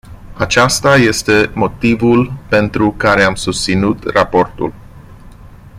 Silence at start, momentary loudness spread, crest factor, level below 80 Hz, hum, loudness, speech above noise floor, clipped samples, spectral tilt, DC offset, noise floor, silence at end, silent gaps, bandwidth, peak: 0.05 s; 6 LU; 14 dB; -36 dBFS; none; -13 LUFS; 23 dB; under 0.1%; -4.5 dB/octave; under 0.1%; -36 dBFS; 0 s; none; 15.5 kHz; 0 dBFS